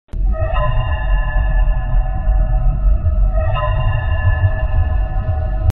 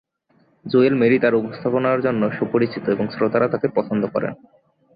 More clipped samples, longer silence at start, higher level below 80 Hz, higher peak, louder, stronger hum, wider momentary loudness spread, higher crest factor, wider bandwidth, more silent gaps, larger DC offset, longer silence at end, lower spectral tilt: neither; second, 0.05 s vs 0.65 s; first, -16 dBFS vs -60 dBFS; first, 0 dBFS vs -4 dBFS; about the same, -19 LUFS vs -20 LUFS; neither; second, 3 LU vs 7 LU; about the same, 14 dB vs 16 dB; second, 3.9 kHz vs 5 kHz; neither; first, 3% vs under 0.1%; second, 0 s vs 0.6 s; second, -9 dB/octave vs -11.5 dB/octave